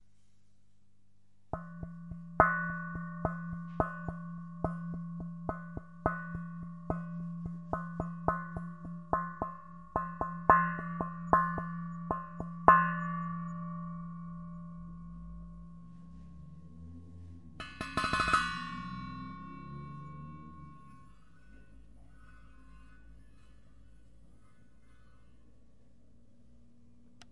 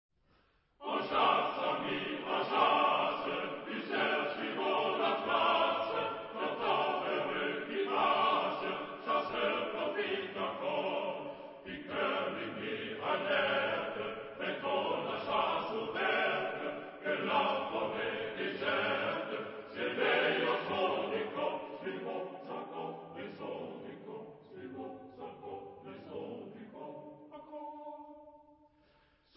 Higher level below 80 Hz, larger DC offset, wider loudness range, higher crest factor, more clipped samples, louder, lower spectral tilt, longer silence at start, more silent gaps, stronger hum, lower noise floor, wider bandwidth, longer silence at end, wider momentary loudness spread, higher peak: first, -54 dBFS vs -74 dBFS; first, 0.2% vs under 0.1%; first, 18 LU vs 15 LU; first, 34 dB vs 20 dB; neither; about the same, -34 LUFS vs -34 LUFS; first, -6.5 dB/octave vs -1 dB/octave; first, 1.55 s vs 0.8 s; neither; neither; about the same, -71 dBFS vs -71 dBFS; first, 11.5 kHz vs 5.6 kHz; second, 0.05 s vs 0.95 s; first, 23 LU vs 18 LU; first, -4 dBFS vs -14 dBFS